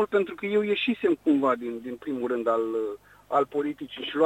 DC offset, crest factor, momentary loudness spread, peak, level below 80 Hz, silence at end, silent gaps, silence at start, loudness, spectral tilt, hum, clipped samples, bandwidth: under 0.1%; 16 dB; 11 LU; -10 dBFS; -66 dBFS; 0 s; none; 0 s; -27 LUFS; -6.5 dB/octave; 50 Hz at -65 dBFS; under 0.1%; 12.5 kHz